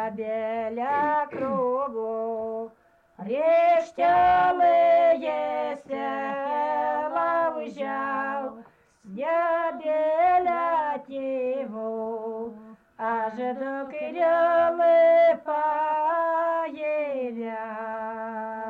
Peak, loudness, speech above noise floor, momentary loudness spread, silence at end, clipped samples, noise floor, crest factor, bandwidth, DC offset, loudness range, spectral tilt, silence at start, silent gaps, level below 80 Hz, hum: -14 dBFS; -25 LUFS; 28 dB; 13 LU; 0 s; under 0.1%; -51 dBFS; 12 dB; 6.4 kHz; under 0.1%; 6 LU; -6.5 dB/octave; 0 s; none; -64 dBFS; none